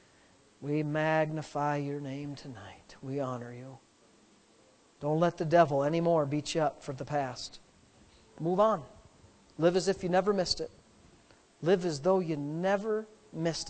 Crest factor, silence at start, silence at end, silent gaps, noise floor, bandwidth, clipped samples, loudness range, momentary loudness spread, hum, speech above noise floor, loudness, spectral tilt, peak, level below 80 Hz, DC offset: 22 dB; 0.6 s; 0 s; none; -63 dBFS; 9 kHz; under 0.1%; 7 LU; 17 LU; none; 33 dB; -31 LUFS; -5.5 dB/octave; -10 dBFS; -64 dBFS; under 0.1%